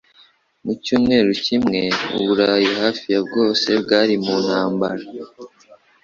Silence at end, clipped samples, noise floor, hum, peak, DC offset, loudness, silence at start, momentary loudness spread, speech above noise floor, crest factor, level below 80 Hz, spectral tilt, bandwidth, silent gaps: 0.3 s; under 0.1%; -54 dBFS; none; -2 dBFS; under 0.1%; -18 LUFS; 0.65 s; 12 LU; 36 dB; 18 dB; -54 dBFS; -5 dB/octave; 7.6 kHz; none